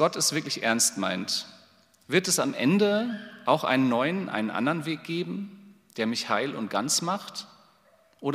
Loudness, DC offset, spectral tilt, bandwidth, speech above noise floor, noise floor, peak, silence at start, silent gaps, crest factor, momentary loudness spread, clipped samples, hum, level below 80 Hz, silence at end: -26 LUFS; under 0.1%; -3.5 dB/octave; 16 kHz; 35 dB; -62 dBFS; -6 dBFS; 0 s; none; 20 dB; 11 LU; under 0.1%; none; -80 dBFS; 0 s